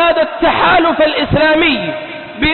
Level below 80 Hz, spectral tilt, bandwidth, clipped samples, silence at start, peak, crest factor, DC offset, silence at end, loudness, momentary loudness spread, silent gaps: -34 dBFS; -10.5 dB/octave; 4.3 kHz; under 0.1%; 0 s; -2 dBFS; 10 dB; under 0.1%; 0 s; -12 LUFS; 11 LU; none